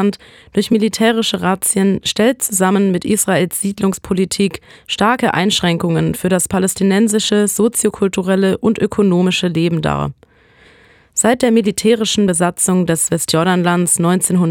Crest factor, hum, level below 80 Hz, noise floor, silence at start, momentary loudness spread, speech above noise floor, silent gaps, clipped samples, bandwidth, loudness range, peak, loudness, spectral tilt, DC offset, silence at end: 14 dB; none; -46 dBFS; -48 dBFS; 0 s; 5 LU; 33 dB; none; under 0.1%; 17.5 kHz; 2 LU; -2 dBFS; -15 LUFS; -4.5 dB/octave; under 0.1%; 0 s